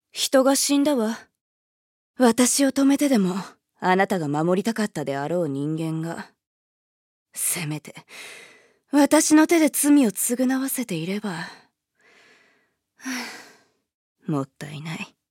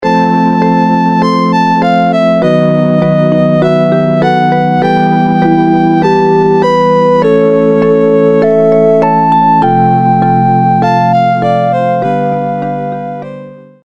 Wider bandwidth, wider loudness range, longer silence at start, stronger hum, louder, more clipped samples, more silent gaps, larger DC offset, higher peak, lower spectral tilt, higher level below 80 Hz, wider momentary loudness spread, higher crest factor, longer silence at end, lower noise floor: first, 17 kHz vs 7.8 kHz; first, 14 LU vs 2 LU; first, 0.15 s vs 0 s; neither; second, -22 LUFS vs -9 LUFS; neither; first, 1.41-2.14 s, 6.47-7.26 s, 13.94-14.15 s vs none; second, under 0.1% vs 0.6%; second, -4 dBFS vs 0 dBFS; second, -4 dB/octave vs -8.5 dB/octave; second, -76 dBFS vs -48 dBFS; first, 19 LU vs 4 LU; first, 20 dB vs 8 dB; about the same, 0.25 s vs 0.25 s; first, -67 dBFS vs -29 dBFS